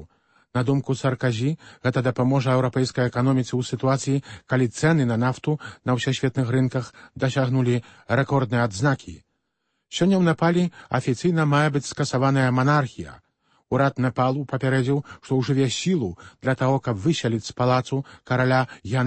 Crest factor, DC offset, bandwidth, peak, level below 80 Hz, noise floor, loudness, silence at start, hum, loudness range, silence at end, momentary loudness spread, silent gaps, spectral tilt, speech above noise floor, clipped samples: 16 dB; under 0.1%; 8.8 kHz; -8 dBFS; -56 dBFS; -76 dBFS; -23 LUFS; 0 s; none; 2 LU; 0 s; 7 LU; none; -6.5 dB/octave; 54 dB; under 0.1%